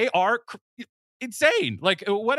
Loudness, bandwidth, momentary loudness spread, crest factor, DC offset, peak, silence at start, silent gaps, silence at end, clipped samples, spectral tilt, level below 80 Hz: -23 LUFS; 15 kHz; 23 LU; 20 dB; under 0.1%; -6 dBFS; 0 s; 0.61-0.77 s, 0.89-1.20 s; 0 s; under 0.1%; -3.5 dB/octave; -76 dBFS